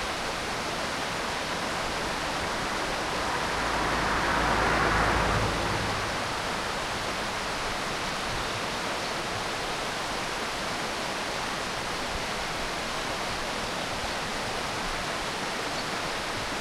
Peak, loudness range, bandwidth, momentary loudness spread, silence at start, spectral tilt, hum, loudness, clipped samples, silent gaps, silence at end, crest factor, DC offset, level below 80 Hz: -12 dBFS; 4 LU; 16.5 kHz; 5 LU; 0 s; -3 dB/octave; none; -29 LUFS; under 0.1%; none; 0 s; 18 dB; under 0.1%; -44 dBFS